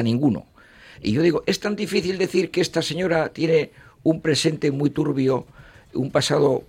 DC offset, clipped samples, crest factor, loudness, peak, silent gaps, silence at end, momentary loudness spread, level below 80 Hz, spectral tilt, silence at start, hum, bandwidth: under 0.1%; under 0.1%; 16 dB; -22 LUFS; -6 dBFS; none; 0.05 s; 6 LU; -54 dBFS; -5.5 dB/octave; 0 s; none; 16 kHz